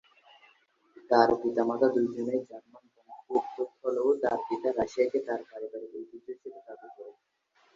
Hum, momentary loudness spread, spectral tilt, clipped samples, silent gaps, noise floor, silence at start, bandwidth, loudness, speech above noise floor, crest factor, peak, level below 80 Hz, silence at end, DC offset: none; 22 LU; -6 dB/octave; under 0.1%; none; -70 dBFS; 0.95 s; 7.6 kHz; -29 LUFS; 41 dB; 24 dB; -6 dBFS; -70 dBFS; 0.65 s; under 0.1%